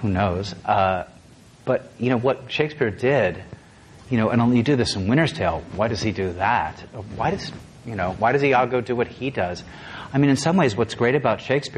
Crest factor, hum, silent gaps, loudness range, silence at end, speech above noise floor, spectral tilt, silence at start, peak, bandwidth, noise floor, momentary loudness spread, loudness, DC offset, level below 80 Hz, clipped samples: 18 dB; none; none; 2 LU; 0 s; 27 dB; -6 dB/octave; 0 s; -4 dBFS; 11.5 kHz; -48 dBFS; 15 LU; -22 LUFS; under 0.1%; -44 dBFS; under 0.1%